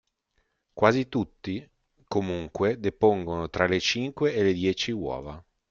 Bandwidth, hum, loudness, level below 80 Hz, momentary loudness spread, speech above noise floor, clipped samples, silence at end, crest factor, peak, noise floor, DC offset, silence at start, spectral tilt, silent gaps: 7.4 kHz; none; -26 LUFS; -56 dBFS; 12 LU; 48 dB; under 0.1%; 0.3 s; 22 dB; -4 dBFS; -74 dBFS; under 0.1%; 0.75 s; -5.5 dB/octave; none